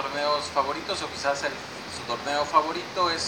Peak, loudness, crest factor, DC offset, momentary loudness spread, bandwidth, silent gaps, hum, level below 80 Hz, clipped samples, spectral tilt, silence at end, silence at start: -6 dBFS; -27 LUFS; 22 dB; under 0.1%; 9 LU; 17 kHz; none; none; -60 dBFS; under 0.1%; -2.5 dB/octave; 0 s; 0 s